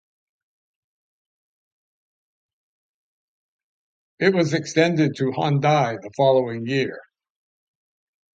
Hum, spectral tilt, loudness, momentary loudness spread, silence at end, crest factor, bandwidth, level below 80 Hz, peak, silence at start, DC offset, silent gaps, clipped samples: none; -6 dB/octave; -21 LUFS; 6 LU; 1.35 s; 22 dB; 8.8 kHz; -68 dBFS; -2 dBFS; 4.2 s; under 0.1%; none; under 0.1%